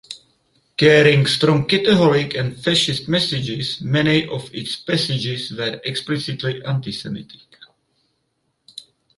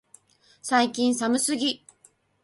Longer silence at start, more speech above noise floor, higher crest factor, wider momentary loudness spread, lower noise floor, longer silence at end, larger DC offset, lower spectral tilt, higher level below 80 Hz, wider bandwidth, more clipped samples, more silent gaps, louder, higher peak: second, 0.1 s vs 0.65 s; first, 52 dB vs 37 dB; about the same, 18 dB vs 18 dB; first, 17 LU vs 11 LU; first, -70 dBFS vs -61 dBFS; first, 1.95 s vs 0.7 s; neither; first, -5.5 dB/octave vs -2 dB/octave; first, -54 dBFS vs -70 dBFS; about the same, 11.5 kHz vs 11.5 kHz; neither; neither; first, -18 LUFS vs -24 LUFS; first, -2 dBFS vs -8 dBFS